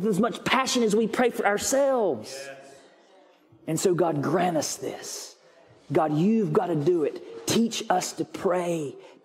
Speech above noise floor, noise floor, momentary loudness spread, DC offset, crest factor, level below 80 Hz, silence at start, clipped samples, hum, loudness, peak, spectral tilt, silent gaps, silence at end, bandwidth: 32 dB; -57 dBFS; 13 LU; under 0.1%; 18 dB; -68 dBFS; 0 s; under 0.1%; none; -25 LUFS; -8 dBFS; -4.5 dB/octave; none; 0.15 s; 16 kHz